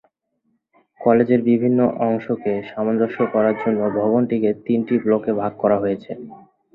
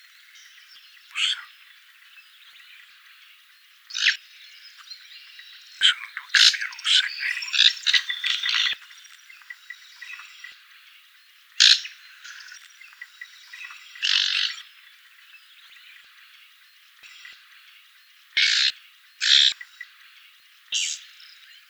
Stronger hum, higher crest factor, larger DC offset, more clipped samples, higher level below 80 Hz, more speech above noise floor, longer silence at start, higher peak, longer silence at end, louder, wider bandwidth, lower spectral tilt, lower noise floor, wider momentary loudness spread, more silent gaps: neither; second, 18 dB vs 28 dB; neither; neither; first, -60 dBFS vs under -90 dBFS; first, 50 dB vs 31 dB; second, 1 s vs 1.15 s; about the same, -2 dBFS vs 0 dBFS; second, 0.4 s vs 0.65 s; about the same, -19 LUFS vs -20 LUFS; second, 4.1 kHz vs over 20 kHz; first, -11 dB/octave vs 7.5 dB/octave; first, -69 dBFS vs -54 dBFS; second, 7 LU vs 27 LU; neither